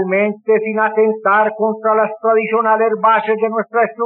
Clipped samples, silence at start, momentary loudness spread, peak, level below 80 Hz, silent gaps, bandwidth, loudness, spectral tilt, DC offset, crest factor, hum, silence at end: under 0.1%; 0 s; 4 LU; -2 dBFS; -70 dBFS; none; 4 kHz; -15 LUFS; -4.5 dB/octave; under 0.1%; 12 dB; none; 0 s